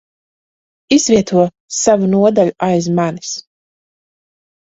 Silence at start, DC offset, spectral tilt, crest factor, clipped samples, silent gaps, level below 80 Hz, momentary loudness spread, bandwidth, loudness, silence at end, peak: 0.9 s; under 0.1%; -5 dB/octave; 16 dB; under 0.1%; 1.60-1.68 s; -52 dBFS; 9 LU; 8 kHz; -14 LUFS; 1.25 s; 0 dBFS